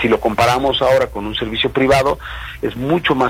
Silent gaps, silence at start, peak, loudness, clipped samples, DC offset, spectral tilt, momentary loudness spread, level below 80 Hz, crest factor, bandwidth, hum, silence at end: none; 0 s; -2 dBFS; -16 LUFS; under 0.1%; under 0.1%; -5 dB/octave; 11 LU; -36 dBFS; 14 dB; 16.5 kHz; none; 0 s